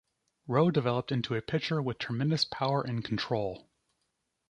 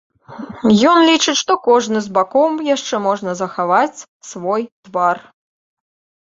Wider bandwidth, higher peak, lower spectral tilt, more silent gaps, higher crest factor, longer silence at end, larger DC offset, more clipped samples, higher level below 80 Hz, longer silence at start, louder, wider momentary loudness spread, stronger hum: first, 10 kHz vs 7.8 kHz; second, -12 dBFS vs -2 dBFS; first, -6.5 dB/octave vs -4 dB/octave; second, none vs 4.08-4.20 s, 4.72-4.83 s; about the same, 20 dB vs 16 dB; second, 0.9 s vs 1.1 s; neither; neither; second, -64 dBFS vs -58 dBFS; first, 0.45 s vs 0.3 s; second, -31 LUFS vs -16 LUFS; second, 7 LU vs 15 LU; neither